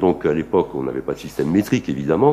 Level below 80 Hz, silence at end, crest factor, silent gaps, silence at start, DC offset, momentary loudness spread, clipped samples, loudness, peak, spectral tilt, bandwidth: -46 dBFS; 0 s; 16 dB; none; 0 s; under 0.1%; 7 LU; under 0.1%; -21 LUFS; -2 dBFS; -7.5 dB/octave; 15.5 kHz